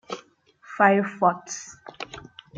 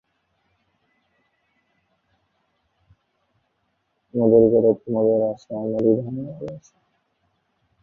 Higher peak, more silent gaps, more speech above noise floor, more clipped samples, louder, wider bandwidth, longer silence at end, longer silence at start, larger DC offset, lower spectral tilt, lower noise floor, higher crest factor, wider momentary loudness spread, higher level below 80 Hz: about the same, -4 dBFS vs -4 dBFS; neither; second, 32 dB vs 52 dB; neither; about the same, -22 LUFS vs -20 LUFS; first, 9 kHz vs 6.6 kHz; second, 0 s vs 1.25 s; second, 0.1 s vs 4.15 s; neither; second, -4.5 dB/octave vs -11 dB/octave; second, -54 dBFS vs -72 dBFS; about the same, 22 dB vs 20 dB; first, 22 LU vs 19 LU; second, -66 dBFS vs -60 dBFS